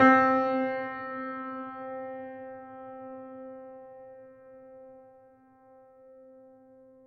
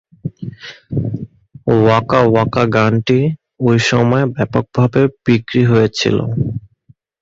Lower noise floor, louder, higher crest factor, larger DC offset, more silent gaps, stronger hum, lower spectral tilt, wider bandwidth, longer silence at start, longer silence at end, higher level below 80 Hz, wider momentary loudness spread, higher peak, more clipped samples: first, -58 dBFS vs -51 dBFS; second, -30 LUFS vs -15 LUFS; first, 24 dB vs 14 dB; neither; neither; neither; about the same, -7 dB/octave vs -7 dB/octave; second, 6.2 kHz vs 7.8 kHz; second, 0 s vs 0.25 s; about the same, 0.7 s vs 0.65 s; second, -74 dBFS vs -44 dBFS; first, 25 LU vs 16 LU; second, -8 dBFS vs 0 dBFS; neither